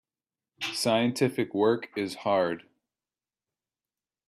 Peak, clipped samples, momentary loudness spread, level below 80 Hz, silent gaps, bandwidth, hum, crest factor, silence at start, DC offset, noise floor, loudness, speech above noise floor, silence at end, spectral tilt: -12 dBFS; under 0.1%; 8 LU; -74 dBFS; none; 15.5 kHz; none; 18 dB; 0.6 s; under 0.1%; under -90 dBFS; -28 LUFS; over 63 dB; 1.7 s; -4.5 dB/octave